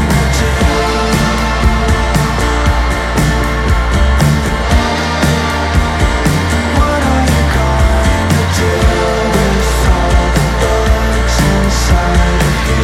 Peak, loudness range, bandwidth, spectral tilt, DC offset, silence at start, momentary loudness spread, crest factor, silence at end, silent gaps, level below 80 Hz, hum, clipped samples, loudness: 0 dBFS; 1 LU; 15.5 kHz; -5 dB/octave; under 0.1%; 0 s; 2 LU; 10 dB; 0 s; none; -14 dBFS; none; under 0.1%; -12 LUFS